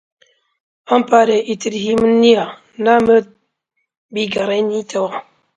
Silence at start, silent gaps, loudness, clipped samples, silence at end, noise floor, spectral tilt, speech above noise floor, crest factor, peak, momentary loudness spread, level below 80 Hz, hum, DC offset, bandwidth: 0.9 s; 3.97-4.09 s; -15 LUFS; under 0.1%; 0.35 s; -72 dBFS; -5 dB/octave; 58 dB; 16 dB; 0 dBFS; 11 LU; -54 dBFS; none; under 0.1%; 9.2 kHz